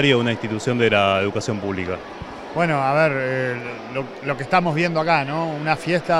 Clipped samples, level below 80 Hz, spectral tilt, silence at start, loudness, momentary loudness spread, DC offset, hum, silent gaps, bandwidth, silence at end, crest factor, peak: under 0.1%; -54 dBFS; -5.5 dB/octave; 0 s; -21 LUFS; 11 LU; under 0.1%; none; none; 12 kHz; 0 s; 18 dB; -2 dBFS